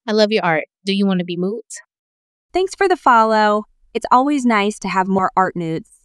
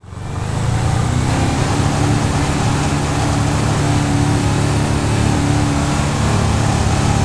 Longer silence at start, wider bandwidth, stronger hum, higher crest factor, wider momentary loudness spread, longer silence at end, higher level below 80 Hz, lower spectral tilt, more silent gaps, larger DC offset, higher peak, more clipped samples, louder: about the same, 0.05 s vs 0.05 s; about the same, 11.5 kHz vs 11 kHz; neither; about the same, 16 dB vs 12 dB; first, 13 LU vs 2 LU; first, 0.2 s vs 0 s; second, -54 dBFS vs -26 dBFS; about the same, -5.5 dB/octave vs -5.5 dB/octave; first, 1.99-2.49 s vs none; neither; about the same, -2 dBFS vs -2 dBFS; neither; about the same, -17 LUFS vs -16 LUFS